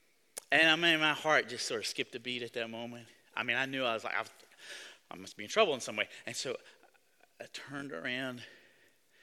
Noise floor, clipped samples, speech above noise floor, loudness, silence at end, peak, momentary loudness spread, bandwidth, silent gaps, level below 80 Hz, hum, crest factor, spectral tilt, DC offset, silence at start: -69 dBFS; under 0.1%; 35 dB; -32 LUFS; 0.7 s; -10 dBFS; 22 LU; 17.5 kHz; none; -80 dBFS; none; 24 dB; -2.5 dB/octave; under 0.1%; 0.35 s